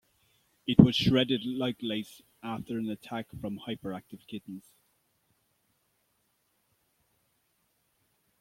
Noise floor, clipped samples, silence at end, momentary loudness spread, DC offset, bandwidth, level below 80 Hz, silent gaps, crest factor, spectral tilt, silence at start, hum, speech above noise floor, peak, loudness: -74 dBFS; under 0.1%; 3.8 s; 22 LU; under 0.1%; 16 kHz; -56 dBFS; none; 30 dB; -7 dB/octave; 0.65 s; none; 46 dB; -2 dBFS; -29 LUFS